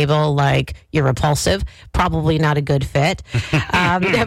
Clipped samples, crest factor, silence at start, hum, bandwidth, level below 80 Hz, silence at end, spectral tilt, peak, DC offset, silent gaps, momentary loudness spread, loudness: under 0.1%; 10 dB; 0 s; none; 15.5 kHz; -32 dBFS; 0 s; -5.5 dB/octave; -8 dBFS; under 0.1%; none; 5 LU; -18 LUFS